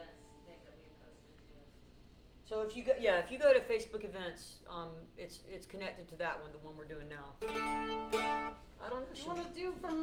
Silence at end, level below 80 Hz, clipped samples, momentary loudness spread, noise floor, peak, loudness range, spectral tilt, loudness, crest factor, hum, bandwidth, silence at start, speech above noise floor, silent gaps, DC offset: 0 s; -60 dBFS; under 0.1%; 20 LU; -60 dBFS; -18 dBFS; 10 LU; -4.5 dB/octave; -38 LUFS; 22 dB; 60 Hz at -70 dBFS; 16.5 kHz; 0 s; 22 dB; none; under 0.1%